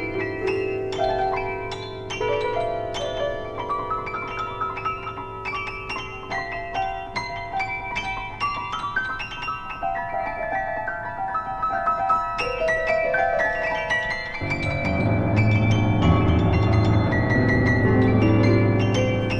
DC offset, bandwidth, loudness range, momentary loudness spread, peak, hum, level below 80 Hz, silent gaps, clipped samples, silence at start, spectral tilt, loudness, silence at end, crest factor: under 0.1%; 8.6 kHz; 9 LU; 10 LU; -8 dBFS; none; -38 dBFS; none; under 0.1%; 0 s; -7 dB/octave; -23 LUFS; 0 s; 16 dB